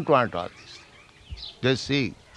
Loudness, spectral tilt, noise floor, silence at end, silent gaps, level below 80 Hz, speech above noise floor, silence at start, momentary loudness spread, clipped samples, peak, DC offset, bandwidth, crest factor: -25 LUFS; -5.5 dB/octave; -51 dBFS; 0.25 s; none; -52 dBFS; 26 dB; 0 s; 22 LU; under 0.1%; -6 dBFS; under 0.1%; 11 kHz; 22 dB